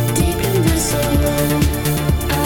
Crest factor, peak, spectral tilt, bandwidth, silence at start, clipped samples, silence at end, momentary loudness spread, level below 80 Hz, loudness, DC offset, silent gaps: 14 dB; -2 dBFS; -5 dB/octave; 19 kHz; 0 s; under 0.1%; 0 s; 2 LU; -24 dBFS; -17 LUFS; under 0.1%; none